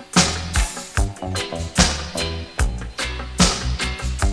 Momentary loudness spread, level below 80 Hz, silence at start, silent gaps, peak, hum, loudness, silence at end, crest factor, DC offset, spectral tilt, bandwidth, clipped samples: 9 LU; -26 dBFS; 0 s; none; 0 dBFS; none; -22 LUFS; 0 s; 20 dB; under 0.1%; -3.5 dB/octave; 11 kHz; under 0.1%